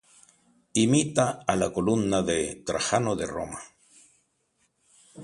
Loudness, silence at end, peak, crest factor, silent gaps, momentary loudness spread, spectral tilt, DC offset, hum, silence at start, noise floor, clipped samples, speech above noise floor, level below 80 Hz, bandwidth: -26 LUFS; 0 s; -6 dBFS; 22 dB; none; 10 LU; -4.5 dB/octave; under 0.1%; none; 0.75 s; -72 dBFS; under 0.1%; 46 dB; -54 dBFS; 11.5 kHz